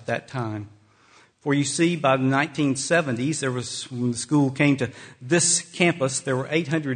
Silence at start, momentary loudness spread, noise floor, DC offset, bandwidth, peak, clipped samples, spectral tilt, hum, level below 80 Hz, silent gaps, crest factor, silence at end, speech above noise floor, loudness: 0 s; 10 LU; -56 dBFS; under 0.1%; 9.6 kHz; -4 dBFS; under 0.1%; -4.5 dB/octave; none; -62 dBFS; none; 20 dB; 0 s; 33 dB; -23 LUFS